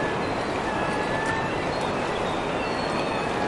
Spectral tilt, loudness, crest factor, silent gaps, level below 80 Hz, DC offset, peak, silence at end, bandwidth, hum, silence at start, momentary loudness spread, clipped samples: -5 dB/octave; -26 LUFS; 14 dB; none; -46 dBFS; under 0.1%; -12 dBFS; 0 s; 11.5 kHz; none; 0 s; 1 LU; under 0.1%